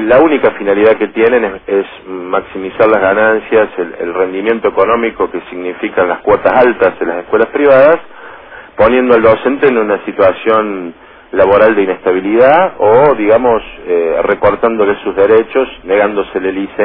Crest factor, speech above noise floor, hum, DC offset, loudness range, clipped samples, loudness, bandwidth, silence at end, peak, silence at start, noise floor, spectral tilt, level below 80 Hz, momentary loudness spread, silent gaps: 10 dB; 22 dB; none; 0.3%; 3 LU; 0.1%; -11 LUFS; 5.2 kHz; 0 s; 0 dBFS; 0 s; -32 dBFS; -9 dB/octave; -42 dBFS; 10 LU; none